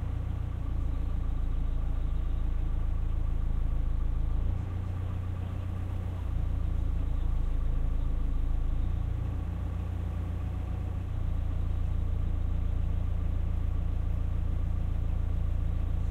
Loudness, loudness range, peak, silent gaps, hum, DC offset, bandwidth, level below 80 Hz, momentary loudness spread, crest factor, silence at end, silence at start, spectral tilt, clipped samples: -34 LUFS; 1 LU; -18 dBFS; none; none; under 0.1%; 4.1 kHz; -30 dBFS; 2 LU; 10 dB; 0 s; 0 s; -9 dB/octave; under 0.1%